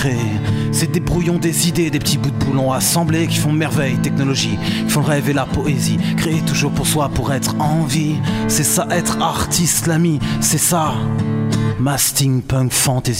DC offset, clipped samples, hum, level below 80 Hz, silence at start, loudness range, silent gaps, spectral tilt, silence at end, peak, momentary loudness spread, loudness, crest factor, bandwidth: under 0.1%; under 0.1%; none; -36 dBFS; 0 s; 1 LU; none; -4.5 dB/octave; 0 s; -2 dBFS; 4 LU; -16 LUFS; 14 dB; 16.5 kHz